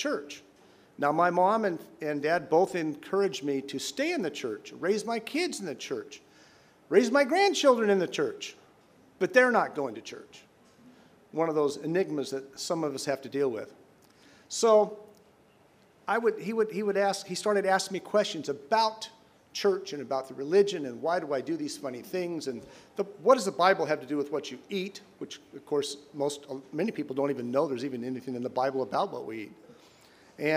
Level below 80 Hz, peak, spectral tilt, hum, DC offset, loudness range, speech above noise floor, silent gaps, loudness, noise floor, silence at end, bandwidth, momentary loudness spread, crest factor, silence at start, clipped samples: -78 dBFS; -6 dBFS; -4 dB/octave; none; under 0.1%; 6 LU; 32 dB; none; -29 LUFS; -61 dBFS; 0 s; 15.5 kHz; 16 LU; 22 dB; 0 s; under 0.1%